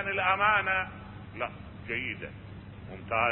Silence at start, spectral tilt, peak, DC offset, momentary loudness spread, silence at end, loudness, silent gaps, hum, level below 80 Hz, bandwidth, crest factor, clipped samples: 0 s; -8.5 dB/octave; -10 dBFS; under 0.1%; 21 LU; 0 s; -29 LUFS; none; none; -52 dBFS; 4.2 kHz; 20 dB; under 0.1%